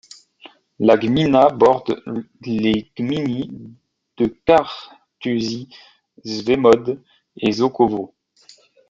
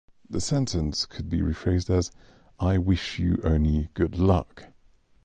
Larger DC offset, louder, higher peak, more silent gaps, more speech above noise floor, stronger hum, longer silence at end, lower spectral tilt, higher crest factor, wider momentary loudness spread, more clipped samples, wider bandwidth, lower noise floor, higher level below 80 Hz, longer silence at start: neither; first, -18 LUFS vs -26 LUFS; first, -2 dBFS vs -8 dBFS; neither; about the same, 33 dB vs 33 dB; neither; first, 0.85 s vs 0.6 s; about the same, -6.5 dB/octave vs -6.5 dB/octave; about the same, 18 dB vs 18 dB; first, 17 LU vs 6 LU; neither; second, 7.8 kHz vs 9.4 kHz; second, -51 dBFS vs -58 dBFS; second, -52 dBFS vs -34 dBFS; first, 0.45 s vs 0.3 s